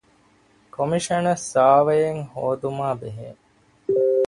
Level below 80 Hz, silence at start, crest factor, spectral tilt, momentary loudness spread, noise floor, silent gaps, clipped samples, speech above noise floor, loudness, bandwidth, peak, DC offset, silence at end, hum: -60 dBFS; 0.8 s; 18 dB; -5.5 dB/octave; 19 LU; -58 dBFS; none; under 0.1%; 37 dB; -21 LUFS; 11.5 kHz; -4 dBFS; under 0.1%; 0 s; none